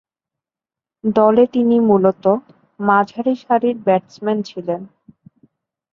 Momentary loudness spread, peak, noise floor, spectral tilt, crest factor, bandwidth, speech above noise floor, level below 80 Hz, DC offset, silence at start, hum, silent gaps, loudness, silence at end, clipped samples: 11 LU; 0 dBFS; -89 dBFS; -8.5 dB/octave; 18 dB; 7 kHz; 73 dB; -60 dBFS; under 0.1%; 1.05 s; none; none; -17 LUFS; 1.05 s; under 0.1%